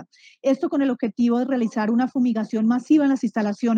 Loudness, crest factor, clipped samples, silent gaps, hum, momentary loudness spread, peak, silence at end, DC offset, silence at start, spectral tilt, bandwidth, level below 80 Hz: -22 LUFS; 12 dB; under 0.1%; none; none; 5 LU; -8 dBFS; 0 s; under 0.1%; 0 s; -7 dB/octave; 7.6 kHz; -72 dBFS